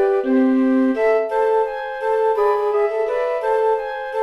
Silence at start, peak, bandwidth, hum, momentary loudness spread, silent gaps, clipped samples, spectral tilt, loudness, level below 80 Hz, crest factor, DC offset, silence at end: 0 s; -8 dBFS; 11 kHz; none; 5 LU; none; under 0.1%; -5.5 dB/octave; -19 LUFS; -58 dBFS; 10 dB; under 0.1%; 0 s